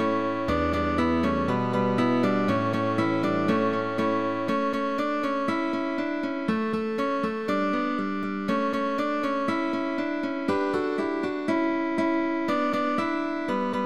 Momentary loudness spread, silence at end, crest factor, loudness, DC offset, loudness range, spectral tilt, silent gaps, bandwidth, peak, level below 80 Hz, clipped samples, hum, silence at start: 4 LU; 0 s; 14 dB; -26 LUFS; 0.5%; 3 LU; -7 dB/octave; none; 13 kHz; -12 dBFS; -50 dBFS; under 0.1%; none; 0 s